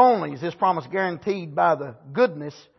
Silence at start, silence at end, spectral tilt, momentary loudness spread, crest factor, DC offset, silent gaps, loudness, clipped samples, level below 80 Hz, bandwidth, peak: 0 s; 0.2 s; -7 dB/octave; 8 LU; 18 dB; under 0.1%; none; -24 LUFS; under 0.1%; -70 dBFS; 6.2 kHz; -4 dBFS